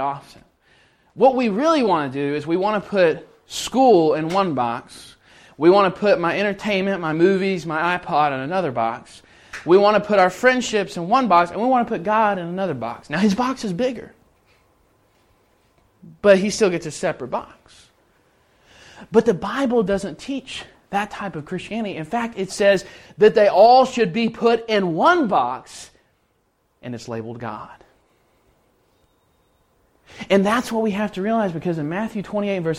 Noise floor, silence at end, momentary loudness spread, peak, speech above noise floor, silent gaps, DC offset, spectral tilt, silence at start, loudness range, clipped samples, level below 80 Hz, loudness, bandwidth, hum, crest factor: -66 dBFS; 0 s; 15 LU; -2 dBFS; 47 dB; none; under 0.1%; -5.5 dB/octave; 0 s; 9 LU; under 0.1%; -56 dBFS; -19 LUFS; 14.5 kHz; none; 18 dB